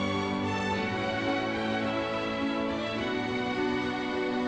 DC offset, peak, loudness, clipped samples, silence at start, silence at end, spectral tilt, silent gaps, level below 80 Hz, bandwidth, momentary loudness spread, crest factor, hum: under 0.1%; -18 dBFS; -30 LUFS; under 0.1%; 0 s; 0 s; -5.5 dB/octave; none; -56 dBFS; 9.4 kHz; 1 LU; 12 dB; none